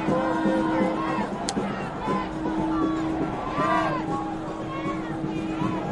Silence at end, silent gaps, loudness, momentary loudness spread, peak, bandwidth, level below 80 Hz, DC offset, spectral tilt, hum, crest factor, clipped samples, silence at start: 0 s; none; -27 LUFS; 6 LU; -6 dBFS; 11.5 kHz; -46 dBFS; under 0.1%; -6 dB/octave; none; 20 dB; under 0.1%; 0 s